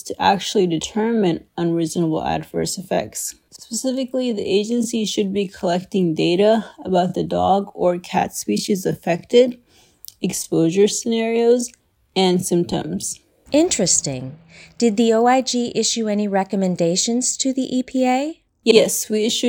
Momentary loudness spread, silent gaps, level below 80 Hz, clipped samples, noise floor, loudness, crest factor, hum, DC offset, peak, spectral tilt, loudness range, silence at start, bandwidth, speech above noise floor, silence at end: 8 LU; none; -56 dBFS; under 0.1%; -45 dBFS; -19 LUFS; 20 dB; none; under 0.1%; 0 dBFS; -4 dB/octave; 4 LU; 0.05 s; 18 kHz; 26 dB; 0 s